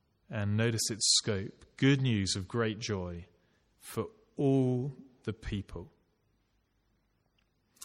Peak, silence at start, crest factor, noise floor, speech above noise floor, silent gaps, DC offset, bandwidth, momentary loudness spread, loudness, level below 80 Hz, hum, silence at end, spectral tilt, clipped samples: -14 dBFS; 0.3 s; 20 dB; -74 dBFS; 43 dB; none; under 0.1%; 15.5 kHz; 16 LU; -31 LUFS; -58 dBFS; none; 0 s; -4 dB/octave; under 0.1%